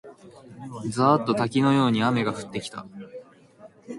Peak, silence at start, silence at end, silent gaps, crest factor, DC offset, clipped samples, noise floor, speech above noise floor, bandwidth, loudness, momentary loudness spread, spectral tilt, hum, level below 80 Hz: -6 dBFS; 0.05 s; 0 s; none; 18 dB; under 0.1%; under 0.1%; -51 dBFS; 27 dB; 11.5 kHz; -23 LUFS; 21 LU; -6.5 dB/octave; none; -64 dBFS